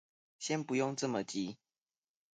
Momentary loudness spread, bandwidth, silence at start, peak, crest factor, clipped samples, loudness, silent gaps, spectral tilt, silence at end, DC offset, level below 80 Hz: 10 LU; 9.4 kHz; 0.4 s; -22 dBFS; 18 dB; under 0.1%; -37 LUFS; none; -4.5 dB/octave; 0.8 s; under 0.1%; -80 dBFS